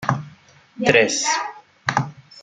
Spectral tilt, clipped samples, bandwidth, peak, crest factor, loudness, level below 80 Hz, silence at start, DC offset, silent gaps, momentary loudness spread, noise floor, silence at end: -3.5 dB/octave; under 0.1%; 11 kHz; 0 dBFS; 22 dB; -20 LUFS; -58 dBFS; 0 s; under 0.1%; none; 14 LU; -49 dBFS; 0 s